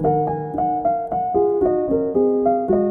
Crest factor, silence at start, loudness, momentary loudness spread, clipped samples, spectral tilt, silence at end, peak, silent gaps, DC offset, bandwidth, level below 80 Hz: 12 dB; 0 s; -20 LUFS; 4 LU; under 0.1%; -12.5 dB/octave; 0 s; -6 dBFS; none; under 0.1%; 2.4 kHz; -46 dBFS